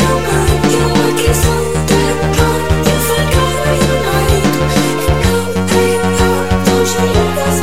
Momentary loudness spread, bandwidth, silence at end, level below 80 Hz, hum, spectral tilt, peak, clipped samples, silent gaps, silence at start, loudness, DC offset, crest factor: 2 LU; 17 kHz; 0 s; -22 dBFS; none; -5 dB/octave; 0 dBFS; under 0.1%; none; 0 s; -12 LUFS; 5%; 12 dB